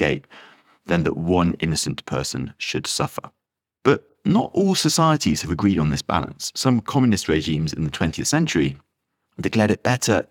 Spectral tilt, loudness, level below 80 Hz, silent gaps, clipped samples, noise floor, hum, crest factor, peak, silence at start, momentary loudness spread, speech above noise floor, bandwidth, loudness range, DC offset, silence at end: -5 dB/octave; -21 LUFS; -46 dBFS; none; under 0.1%; -74 dBFS; none; 20 dB; -2 dBFS; 0 s; 7 LU; 53 dB; 18.5 kHz; 4 LU; under 0.1%; 0.05 s